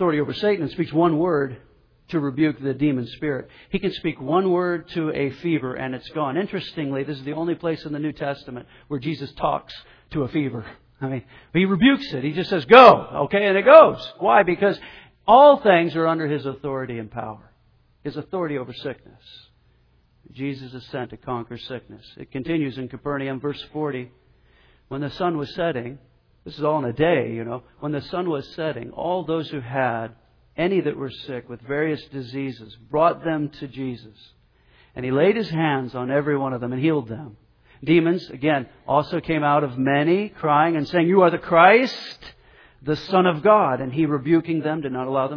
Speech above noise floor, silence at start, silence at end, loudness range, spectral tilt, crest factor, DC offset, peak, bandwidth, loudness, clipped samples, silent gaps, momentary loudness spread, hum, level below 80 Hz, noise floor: 39 dB; 0 s; 0 s; 14 LU; -8 dB/octave; 22 dB; under 0.1%; 0 dBFS; 5.4 kHz; -21 LUFS; under 0.1%; none; 17 LU; none; -54 dBFS; -59 dBFS